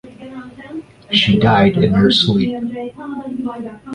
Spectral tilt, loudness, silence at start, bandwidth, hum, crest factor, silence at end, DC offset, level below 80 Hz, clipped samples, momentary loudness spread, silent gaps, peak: -6.5 dB/octave; -15 LUFS; 0.05 s; 10 kHz; none; 16 dB; 0 s; under 0.1%; -42 dBFS; under 0.1%; 21 LU; none; 0 dBFS